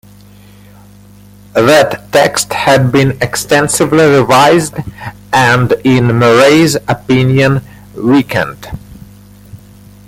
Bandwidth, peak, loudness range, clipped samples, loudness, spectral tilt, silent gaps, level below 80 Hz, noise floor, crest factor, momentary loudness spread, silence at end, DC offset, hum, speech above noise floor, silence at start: 16.5 kHz; 0 dBFS; 3 LU; under 0.1%; -9 LUFS; -5 dB/octave; none; -40 dBFS; -38 dBFS; 10 dB; 12 LU; 0.5 s; under 0.1%; 50 Hz at -35 dBFS; 29 dB; 1.55 s